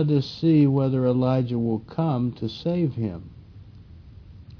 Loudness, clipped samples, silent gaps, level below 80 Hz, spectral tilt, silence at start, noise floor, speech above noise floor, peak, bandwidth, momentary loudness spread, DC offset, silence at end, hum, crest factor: -23 LUFS; under 0.1%; none; -52 dBFS; -9.5 dB/octave; 0 s; -45 dBFS; 23 dB; -8 dBFS; 5.4 kHz; 10 LU; under 0.1%; 0.05 s; none; 14 dB